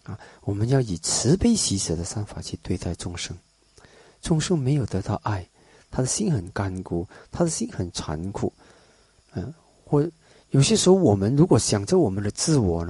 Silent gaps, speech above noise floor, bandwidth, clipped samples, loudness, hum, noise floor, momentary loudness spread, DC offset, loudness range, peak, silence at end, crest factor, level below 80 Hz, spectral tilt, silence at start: none; 35 dB; 11.5 kHz; under 0.1%; -23 LUFS; none; -58 dBFS; 16 LU; under 0.1%; 8 LU; -6 dBFS; 0 s; 18 dB; -42 dBFS; -5.5 dB/octave; 0.1 s